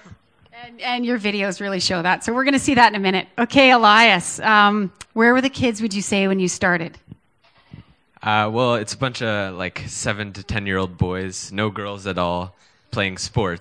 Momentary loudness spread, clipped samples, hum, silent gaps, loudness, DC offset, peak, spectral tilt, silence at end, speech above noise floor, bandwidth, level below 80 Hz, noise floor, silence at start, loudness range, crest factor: 13 LU; under 0.1%; none; none; -19 LUFS; under 0.1%; 0 dBFS; -4 dB/octave; 0 s; 39 dB; 11 kHz; -48 dBFS; -58 dBFS; 0.1 s; 10 LU; 20 dB